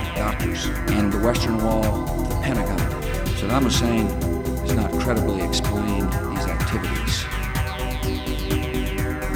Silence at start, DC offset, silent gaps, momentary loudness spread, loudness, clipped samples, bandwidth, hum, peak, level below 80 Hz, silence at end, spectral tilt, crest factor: 0 s; under 0.1%; none; 5 LU; -23 LUFS; under 0.1%; 19 kHz; none; -6 dBFS; -28 dBFS; 0 s; -5.5 dB/octave; 16 dB